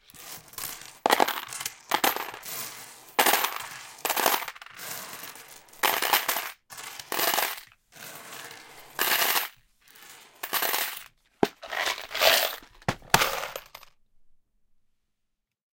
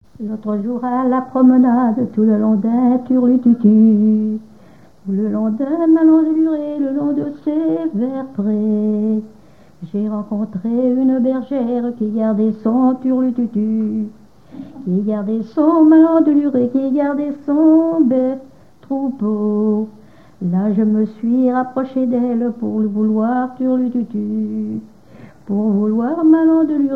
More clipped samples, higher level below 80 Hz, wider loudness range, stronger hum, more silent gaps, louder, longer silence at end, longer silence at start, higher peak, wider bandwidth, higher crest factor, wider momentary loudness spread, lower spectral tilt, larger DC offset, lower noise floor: neither; about the same, -60 dBFS vs -60 dBFS; second, 3 LU vs 6 LU; neither; neither; second, -26 LUFS vs -16 LUFS; first, 1.95 s vs 0 s; about the same, 0.15 s vs 0.2 s; about the same, 0 dBFS vs -2 dBFS; first, 17 kHz vs 3.7 kHz; first, 30 dB vs 14 dB; first, 19 LU vs 10 LU; second, -1 dB/octave vs -11 dB/octave; second, under 0.1% vs 0.4%; first, -79 dBFS vs -46 dBFS